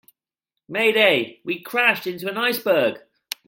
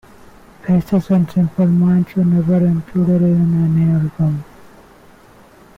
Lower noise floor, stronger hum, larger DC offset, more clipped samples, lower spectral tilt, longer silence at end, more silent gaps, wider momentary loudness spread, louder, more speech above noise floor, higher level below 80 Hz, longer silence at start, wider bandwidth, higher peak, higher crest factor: first, -84 dBFS vs -45 dBFS; neither; neither; neither; second, -3.5 dB/octave vs -10.5 dB/octave; second, 0.5 s vs 1.35 s; neither; first, 13 LU vs 5 LU; second, -20 LUFS vs -15 LUFS; first, 64 dB vs 31 dB; second, -74 dBFS vs -46 dBFS; about the same, 0.7 s vs 0.65 s; first, 17 kHz vs 4.1 kHz; first, -4 dBFS vs -8 dBFS; first, 20 dB vs 8 dB